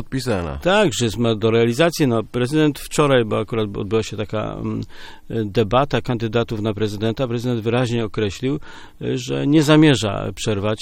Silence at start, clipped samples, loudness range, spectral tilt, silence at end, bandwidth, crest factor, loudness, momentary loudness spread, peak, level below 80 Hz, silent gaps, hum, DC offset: 0 s; under 0.1%; 4 LU; -6 dB/octave; 0 s; 16.5 kHz; 18 dB; -20 LUFS; 9 LU; 0 dBFS; -40 dBFS; none; none; under 0.1%